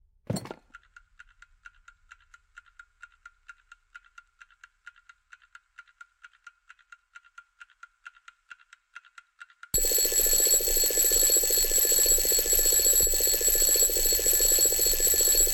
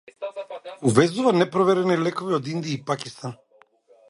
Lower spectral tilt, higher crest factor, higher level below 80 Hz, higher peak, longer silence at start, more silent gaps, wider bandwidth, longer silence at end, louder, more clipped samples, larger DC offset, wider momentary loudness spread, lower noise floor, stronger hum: second, 0 dB/octave vs -6 dB/octave; about the same, 18 dB vs 22 dB; first, -42 dBFS vs -62 dBFS; second, -10 dBFS vs -2 dBFS; about the same, 0.3 s vs 0.2 s; neither; first, 17 kHz vs 11.5 kHz; second, 0 s vs 0.75 s; about the same, -20 LUFS vs -22 LUFS; neither; neither; second, 4 LU vs 16 LU; about the same, -57 dBFS vs -57 dBFS; neither